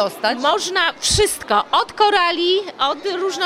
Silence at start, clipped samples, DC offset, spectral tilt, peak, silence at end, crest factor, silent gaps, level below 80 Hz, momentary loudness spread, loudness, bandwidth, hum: 0 s; under 0.1%; under 0.1%; -2 dB/octave; -2 dBFS; 0 s; 16 dB; none; -42 dBFS; 5 LU; -17 LUFS; 16 kHz; none